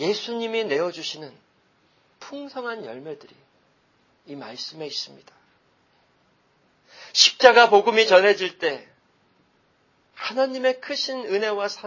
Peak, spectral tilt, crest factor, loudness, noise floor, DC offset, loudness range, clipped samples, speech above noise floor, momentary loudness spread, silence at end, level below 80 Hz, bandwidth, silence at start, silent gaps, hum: 0 dBFS; -1.5 dB/octave; 24 dB; -20 LUFS; -64 dBFS; under 0.1%; 19 LU; under 0.1%; 42 dB; 23 LU; 0 s; -74 dBFS; 7.4 kHz; 0 s; none; none